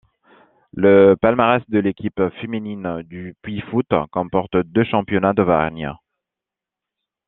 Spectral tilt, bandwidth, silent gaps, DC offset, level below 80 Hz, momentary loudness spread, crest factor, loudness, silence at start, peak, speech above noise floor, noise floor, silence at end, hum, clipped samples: -10.5 dB/octave; 4 kHz; none; under 0.1%; -50 dBFS; 17 LU; 18 dB; -18 LUFS; 0.75 s; 0 dBFS; 69 dB; -87 dBFS; 1.35 s; none; under 0.1%